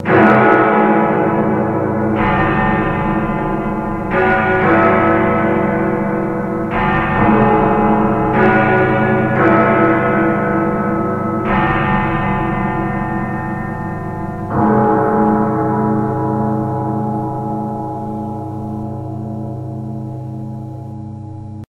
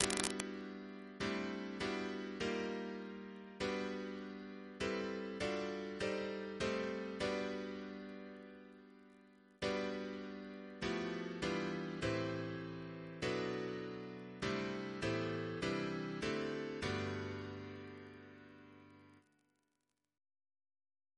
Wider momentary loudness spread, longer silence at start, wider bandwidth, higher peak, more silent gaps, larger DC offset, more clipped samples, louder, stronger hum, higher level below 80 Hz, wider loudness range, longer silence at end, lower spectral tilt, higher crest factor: about the same, 13 LU vs 13 LU; about the same, 0 s vs 0 s; second, 5.4 kHz vs 11 kHz; first, 0 dBFS vs -8 dBFS; neither; neither; neither; first, -15 LUFS vs -42 LUFS; neither; first, -34 dBFS vs -66 dBFS; first, 9 LU vs 5 LU; second, 0.05 s vs 2 s; first, -9 dB/octave vs -4.5 dB/octave; second, 14 dB vs 34 dB